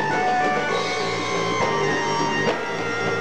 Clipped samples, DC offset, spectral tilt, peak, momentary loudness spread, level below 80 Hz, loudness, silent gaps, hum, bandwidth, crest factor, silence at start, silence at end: under 0.1%; 1%; -4 dB/octave; -10 dBFS; 3 LU; -58 dBFS; -22 LUFS; none; none; 13.5 kHz; 14 dB; 0 s; 0 s